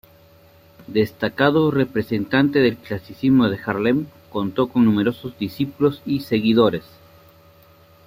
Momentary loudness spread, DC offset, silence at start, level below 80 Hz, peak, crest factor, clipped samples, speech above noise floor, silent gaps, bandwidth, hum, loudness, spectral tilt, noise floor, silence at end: 10 LU; under 0.1%; 0.8 s; -54 dBFS; -2 dBFS; 18 dB; under 0.1%; 31 dB; none; 16 kHz; none; -20 LUFS; -8 dB/octave; -51 dBFS; 1.25 s